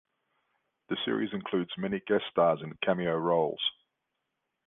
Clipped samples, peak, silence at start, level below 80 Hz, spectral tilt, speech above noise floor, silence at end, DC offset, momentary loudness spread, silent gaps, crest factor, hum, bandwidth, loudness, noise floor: under 0.1%; -12 dBFS; 0.9 s; -68 dBFS; -9 dB/octave; 54 dB; 0.95 s; under 0.1%; 7 LU; none; 20 dB; none; 4 kHz; -30 LUFS; -83 dBFS